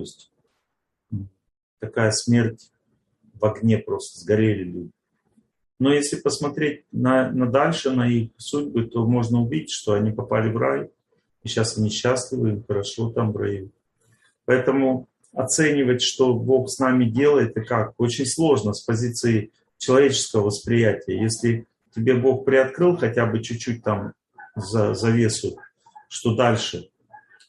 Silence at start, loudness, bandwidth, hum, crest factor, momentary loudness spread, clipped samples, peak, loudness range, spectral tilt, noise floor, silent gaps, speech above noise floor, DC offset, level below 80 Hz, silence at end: 0 s; -22 LUFS; 12 kHz; none; 20 dB; 11 LU; under 0.1%; -2 dBFS; 5 LU; -5.5 dB/octave; -78 dBFS; 1.63-1.77 s; 57 dB; under 0.1%; -58 dBFS; 0.65 s